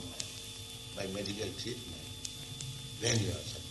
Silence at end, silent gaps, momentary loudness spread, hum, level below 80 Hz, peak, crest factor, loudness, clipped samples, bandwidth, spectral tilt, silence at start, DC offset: 0 s; none; 11 LU; none; -58 dBFS; -12 dBFS; 26 dB; -38 LUFS; under 0.1%; 12 kHz; -3.5 dB/octave; 0 s; under 0.1%